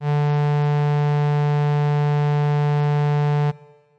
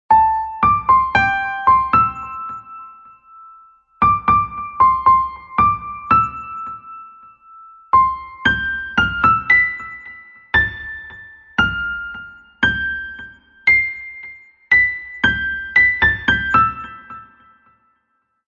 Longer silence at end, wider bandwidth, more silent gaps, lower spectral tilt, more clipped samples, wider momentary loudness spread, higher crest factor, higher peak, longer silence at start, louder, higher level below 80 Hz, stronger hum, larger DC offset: second, 0.4 s vs 1.25 s; second, 6.2 kHz vs 7.2 kHz; neither; first, -9 dB/octave vs -5 dB/octave; neither; second, 1 LU vs 19 LU; second, 4 dB vs 16 dB; second, -16 dBFS vs -2 dBFS; about the same, 0 s vs 0.1 s; second, -20 LUFS vs -16 LUFS; second, -66 dBFS vs -40 dBFS; neither; neither